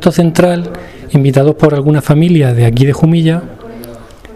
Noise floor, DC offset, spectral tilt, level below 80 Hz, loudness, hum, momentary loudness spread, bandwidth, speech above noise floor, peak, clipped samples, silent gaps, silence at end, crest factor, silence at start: -31 dBFS; 0.4%; -7.5 dB/octave; -36 dBFS; -10 LUFS; none; 20 LU; 14 kHz; 23 dB; 0 dBFS; 0.5%; none; 0 s; 10 dB; 0 s